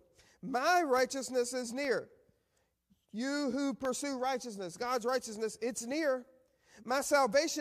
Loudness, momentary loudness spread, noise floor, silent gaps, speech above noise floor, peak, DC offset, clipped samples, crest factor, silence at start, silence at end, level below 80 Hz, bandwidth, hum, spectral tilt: -34 LUFS; 11 LU; -78 dBFS; none; 45 dB; -16 dBFS; under 0.1%; under 0.1%; 18 dB; 0.45 s; 0 s; -74 dBFS; 15 kHz; none; -3 dB/octave